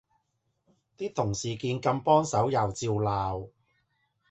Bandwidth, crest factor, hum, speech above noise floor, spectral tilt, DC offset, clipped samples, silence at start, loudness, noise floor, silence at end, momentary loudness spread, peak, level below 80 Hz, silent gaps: 8.4 kHz; 20 dB; none; 50 dB; -5.5 dB/octave; under 0.1%; under 0.1%; 1 s; -28 LUFS; -77 dBFS; 0.85 s; 12 LU; -8 dBFS; -54 dBFS; none